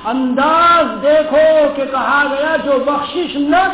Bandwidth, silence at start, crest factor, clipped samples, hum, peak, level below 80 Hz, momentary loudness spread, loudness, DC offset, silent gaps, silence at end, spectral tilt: 4 kHz; 0 s; 10 dB; under 0.1%; none; -2 dBFS; -46 dBFS; 7 LU; -13 LUFS; under 0.1%; none; 0 s; -8 dB/octave